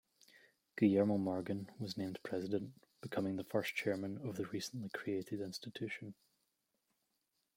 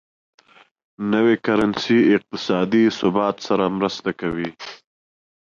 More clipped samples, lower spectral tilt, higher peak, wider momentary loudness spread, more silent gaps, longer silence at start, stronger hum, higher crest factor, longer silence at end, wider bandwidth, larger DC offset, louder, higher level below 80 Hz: neither; about the same, -6 dB/octave vs -6 dB/octave; second, -20 dBFS vs -6 dBFS; about the same, 12 LU vs 11 LU; neither; second, 0.75 s vs 1 s; neither; about the same, 20 dB vs 16 dB; first, 1.45 s vs 0.8 s; first, 16.5 kHz vs 7.4 kHz; neither; second, -40 LUFS vs -20 LUFS; second, -80 dBFS vs -56 dBFS